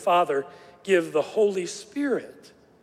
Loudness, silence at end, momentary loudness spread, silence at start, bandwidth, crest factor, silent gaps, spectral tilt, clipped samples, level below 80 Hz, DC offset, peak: -25 LUFS; 0.5 s; 16 LU; 0 s; 14.5 kHz; 18 dB; none; -4.5 dB/octave; under 0.1%; -74 dBFS; under 0.1%; -8 dBFS